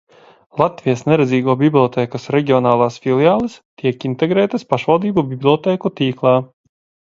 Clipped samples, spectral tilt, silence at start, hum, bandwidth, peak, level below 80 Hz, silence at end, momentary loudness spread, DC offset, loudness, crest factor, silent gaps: under 0.1%; -7.5 dB/octave; 0.55 s; none; 7.6 kHz; 0 dBFS; -56 dBFS; 0.6 s; 6 LU; under 0.1%; -16 LUFS; 16 dB; 3.65-3.77 s